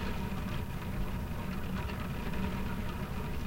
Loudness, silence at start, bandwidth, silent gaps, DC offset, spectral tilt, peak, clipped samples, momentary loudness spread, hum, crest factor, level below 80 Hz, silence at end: -38 LUFS; 0 s; 16 kHz; none; under 0.1%; -6.5 dB/octave; -20 dBFS; under 0.1%; 2 LU; none; 16 dB; -40 dBFS; 0 s